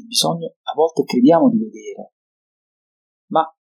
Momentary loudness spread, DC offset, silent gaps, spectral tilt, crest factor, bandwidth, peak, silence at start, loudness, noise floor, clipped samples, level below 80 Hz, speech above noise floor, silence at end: 20 LU; under 0.1%; 0.56-0.64 s, 2.13-3.28 s; -4.5 dB/octave; 18 dB; 16.5 kHz; -2 dBFS; 0.1 s; -17 LUFS; under -90 dBFS; under 0.1%; -76 dBFS; over 73 dB; 0.15 s